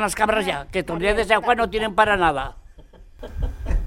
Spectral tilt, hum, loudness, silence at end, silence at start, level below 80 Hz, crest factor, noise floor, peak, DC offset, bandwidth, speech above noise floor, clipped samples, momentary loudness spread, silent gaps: -4.5 dB/octave; none; -21 LUFS; 0 s; 0 s; -32 dBFS; 20 dB; -45 dBFS; -2 dBFS; under 0.1%; 16 kHz; 25 dB; under 0.1%; 14 LU; none